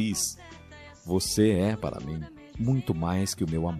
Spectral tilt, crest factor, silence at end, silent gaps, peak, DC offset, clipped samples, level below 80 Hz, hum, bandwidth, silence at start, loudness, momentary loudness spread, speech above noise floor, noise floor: -5 dB/octave; 18 dB; 0 s; none; -10 dBFS; under 0.1%; under 0.1%; -50 dBFS; none; 14.5 kHz; 0 s; -28 LUFS; 21 LU; 21 dB; -48 dBFS